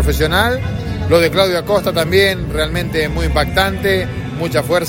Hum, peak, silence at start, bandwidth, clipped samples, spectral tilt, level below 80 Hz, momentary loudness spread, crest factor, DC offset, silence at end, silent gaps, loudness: none; 0 dBFS; 0 s; 16.5 kHz; under 0.1%; -5 dB/octave; -26 dBFS; 7 LU; 14 dB; under 0.1%; 0 s; none; -15 LUFS